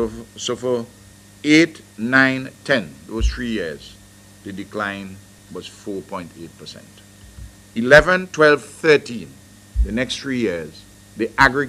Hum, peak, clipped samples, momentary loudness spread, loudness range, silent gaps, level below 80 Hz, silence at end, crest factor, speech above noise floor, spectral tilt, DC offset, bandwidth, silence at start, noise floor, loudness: 50 Hz at -50 dBFS; 0 dBFS; under 0.1%; 22 LU; 14 LU; none; -34 dBFS; 0 s; 20 dB; 20 dB; -4.5 dB/octave; under 0.1%; 15.5 kHz; 0 s; -40 dBFS; -18 LUFS